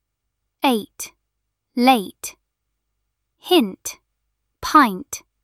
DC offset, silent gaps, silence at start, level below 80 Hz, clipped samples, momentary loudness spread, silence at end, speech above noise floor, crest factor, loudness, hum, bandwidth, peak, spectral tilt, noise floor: under 0.1%; none; 0.65 s; -56 dBFS; under 0.1%; 19 LU; 0.25 s; 59 dB; 20 dB; -18 LUFS; none; 15 kHz; -2 dBFS; -3 dB/octave; -77 dBFS